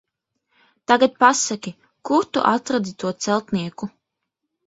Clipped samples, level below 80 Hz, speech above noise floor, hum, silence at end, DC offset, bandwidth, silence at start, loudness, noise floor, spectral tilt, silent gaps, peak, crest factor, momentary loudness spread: under 0.1%; -64 dBFS; 60 dB; none; 0.8 s; under 0.1%; 8 kHz; 0.9 s; -20 LUFS; -80 dBFS; -3.5 dB/octave; none; 0 dBFS; 22 dB; 18 LU